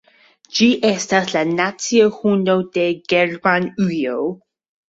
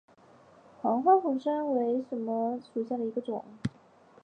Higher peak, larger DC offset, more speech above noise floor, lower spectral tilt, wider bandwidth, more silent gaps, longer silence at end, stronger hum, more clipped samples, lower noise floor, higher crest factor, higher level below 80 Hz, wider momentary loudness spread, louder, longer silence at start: first, -2 dBFS vs -10 dBFS; neither; first, 34 dB vs 29 dB; second, -4.5 dB/octave vs -8.5 dB/octave; second, 8.2 kHz vs 9.4 kHz; neither; about the same, 0.55 s vs 0.55 s; neither; neither; second, -52 dBFS vs -58 dBFS; about the same, 16 dB vs 20 dB; first, -60 dBFS vs -68 dBFS; second, 7 LU vs 14 LU; first, -18 LUFS vs -30 LUFS; second, 0.55 s vs 0.85 s